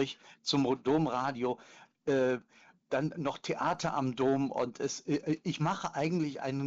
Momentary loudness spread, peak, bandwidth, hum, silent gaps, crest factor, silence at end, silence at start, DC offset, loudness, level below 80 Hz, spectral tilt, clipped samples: 7 LU; -18 dBFS; 8 kHz; none; none; 14 dB; 0 s; 0 s; under 0.1%; -33 LUFS; -68 dBFS; -5.5 dB/octave; under 0.1%